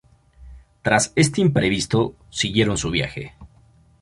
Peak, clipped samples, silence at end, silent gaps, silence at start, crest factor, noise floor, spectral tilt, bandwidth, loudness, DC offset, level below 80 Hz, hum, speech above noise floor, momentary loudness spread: -2 dBFS; under 0.1%; 0.55 s; none; 0.4 s; 20 dB; -54 dBFS; -4.5 dB/octave; 11.5 kHz; -20 LUFS; under 0.1%; -44 dBFS; none; 33 dB; 11 LU